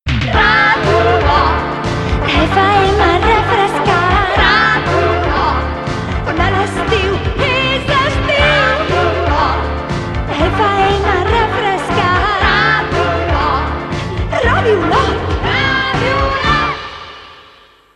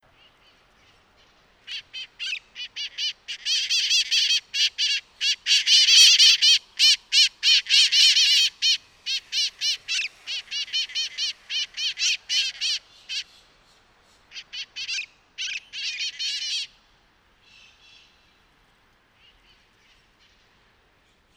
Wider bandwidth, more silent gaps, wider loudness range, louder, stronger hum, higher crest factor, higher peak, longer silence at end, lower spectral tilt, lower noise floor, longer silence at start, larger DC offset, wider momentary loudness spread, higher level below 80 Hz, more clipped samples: second, 11.5 kHz vs 18.5 kHz; neither; second, 3 LU vs 17 LU; first, -13 LUFS vs -19 LUFS; neither; second, 12 dB vs 24 dB; about the same, 0 dBFS vs 0 dBFS; second, 0.55 s vs 4.7 s; first, -5.5 dB/octave vs 5.5 dB/octave; second, -44 dBFS vs -62 dBFS; second, 0.05 s vs 1.7 s; neither; second, 8 LU vs 18 LU; first, -24 dBFS vs -70 dBFS; neither